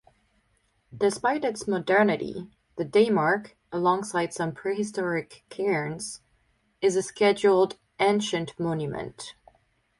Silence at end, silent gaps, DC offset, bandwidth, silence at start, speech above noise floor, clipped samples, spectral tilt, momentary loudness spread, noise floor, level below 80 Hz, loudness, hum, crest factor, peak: 0.7 s; none; under 0.1%; 11.5 kHz; 0.9 s; 44 dB; under 0.1%; -5 dB/octave; 14 LU; -69 dBFS; -64 dBFS; -26 LUFS; none; 18 dB; -8 dBFS